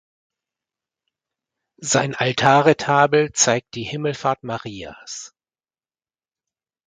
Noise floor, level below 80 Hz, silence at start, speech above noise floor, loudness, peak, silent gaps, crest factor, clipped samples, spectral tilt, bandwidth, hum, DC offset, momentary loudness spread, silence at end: under -90 dBFS; -58 dBFS; 1.8 s; over 71 dB; -19 LUFS; 0 dBFS; none; 22 dB; under 0.1%; -3.5 dB/octave; 10 kHz; none; under 0.1%; 18 LU; 1.6 s